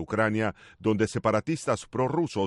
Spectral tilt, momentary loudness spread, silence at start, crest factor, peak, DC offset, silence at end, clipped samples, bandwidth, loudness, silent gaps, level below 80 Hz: -6 dB/octave; 4 LU; 0 s; 16 dB; -12 dBFS; under 0.1%; 0 s; under 0.1%; 11.5 kHz; -28 LUFS; none; -58 dBFS